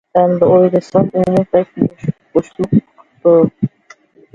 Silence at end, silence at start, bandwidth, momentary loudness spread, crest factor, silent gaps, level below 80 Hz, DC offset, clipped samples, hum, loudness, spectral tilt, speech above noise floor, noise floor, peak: 0.65 s; 0.15 s; 7.6 kHz; 8 LU; 14 dB; none; -50 dBFS; under 0.1%; under 0.1%; none; -14 LUFS; -9.5 dB/octave; 34 dB; -46 dBFS; 0 dBFS